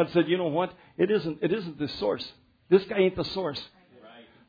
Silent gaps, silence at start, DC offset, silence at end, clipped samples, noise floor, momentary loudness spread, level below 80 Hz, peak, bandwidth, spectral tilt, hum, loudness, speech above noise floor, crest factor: none; 0 s; under 0.1%; 0.3 s; under 0.1%; -52 dBFS; 10 LU; -60 dBFS; -8 dBFS; 5 kHz; -7.5 dB/octave; none; -27 LUFS; 25 dB; 20 dB